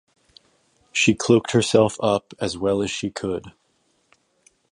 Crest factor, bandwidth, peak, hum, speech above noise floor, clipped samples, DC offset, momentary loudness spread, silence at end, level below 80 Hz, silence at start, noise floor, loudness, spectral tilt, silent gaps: 20 dB; 11.5 kHz; -2 dBFS; none; 46 dB; under 0.1%; under 0.1%; 11 LU; 1.2 s; -54 dBFS; 0.95 s; -66 dBFS; -21 LUFS; -4.5 dB/octave; none